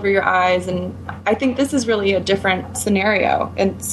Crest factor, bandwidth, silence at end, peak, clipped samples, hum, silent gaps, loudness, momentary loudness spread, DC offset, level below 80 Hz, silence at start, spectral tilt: 16 dB; 13 kHz; 0 s; -2 dBFS; under 0.1%; none; none; -18 LUFS; 7 LU; under 0.1%; -48 dBFS; 0 s; -4.5 dB/octave